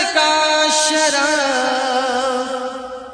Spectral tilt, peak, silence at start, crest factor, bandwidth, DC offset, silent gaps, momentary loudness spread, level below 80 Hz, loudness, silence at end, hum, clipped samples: 0.5 dB/octave; -2 dBFS; 0 s; 14 dB; 10.5 kHz; under 0.1%; none; 10 LU; -56 dBFS; -16 LUFS; 0 s; none; under 0.1%